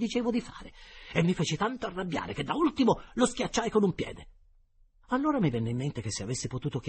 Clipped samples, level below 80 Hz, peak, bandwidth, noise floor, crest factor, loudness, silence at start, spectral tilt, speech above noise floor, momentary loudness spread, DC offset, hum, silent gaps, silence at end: under 0.1%; -52 dBFS; -10 dBFS; 8.8 kHz; -62 dBFS; 20 dB; -30 LUFS; 0 s; -5.5 dB/octave; 32 dB; 11 LU; under 0.1%; none; none; 0 s